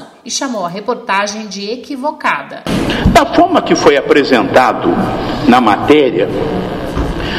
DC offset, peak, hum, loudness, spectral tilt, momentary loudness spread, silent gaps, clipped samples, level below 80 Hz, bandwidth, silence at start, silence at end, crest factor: under 0.1%; 0 dBFS; none; -12 LUFS; -5 dB/octave; 10 LU; none; 0.2%; -28 dBFS; 15.5 kHz; 0 s; 0 s; 12 dB